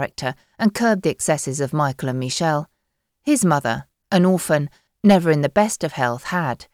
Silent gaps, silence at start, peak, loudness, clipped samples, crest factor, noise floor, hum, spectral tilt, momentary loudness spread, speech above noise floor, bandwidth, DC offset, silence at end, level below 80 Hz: none; 0 s; -4 dBFS; -20 LUFS; under 0.1%; 16 dB; -75 dBFS; none; -5.5 dB/octave; 10 LU; 56 dB; 16 kHz; under 0.1%; 0.1 s; -56 dBFS